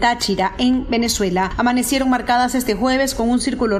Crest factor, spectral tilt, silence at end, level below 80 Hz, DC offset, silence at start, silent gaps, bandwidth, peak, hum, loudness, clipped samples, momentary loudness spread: 14 dB; -3.5 dB/octave; 0 s; -36 dBFS; under 0.1%; 0 s; none; 14.5 kHz; -4 dBFS; none; -18 LUFS; under 0.1%; 2 LU